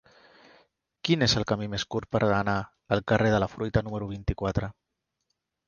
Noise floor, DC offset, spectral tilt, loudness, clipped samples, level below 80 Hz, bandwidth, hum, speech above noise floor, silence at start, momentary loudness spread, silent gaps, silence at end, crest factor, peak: -80 dBFS; under 0.1%; -5.5 dB/octave; -27 LUFS; under 0.1%; -44 dBFS; 7.2 kHz; none; 53 dB; 1.05 s; 9 LU; none; 0.95 s; 22 dB; -6 dBFS